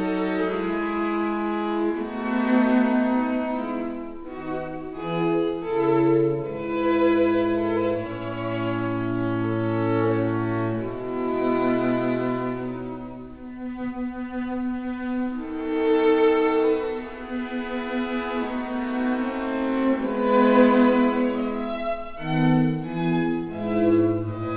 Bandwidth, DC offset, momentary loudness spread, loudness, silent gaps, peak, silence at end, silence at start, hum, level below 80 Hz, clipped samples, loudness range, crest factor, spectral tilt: 4 kHz; 0.3%; 11 LU; -24 LUFS; none; -6 dBFS; 0 s; 0 s; none; -52 dBFS; under 0.1%; 5 LU; 18 dB; -11 dB/octave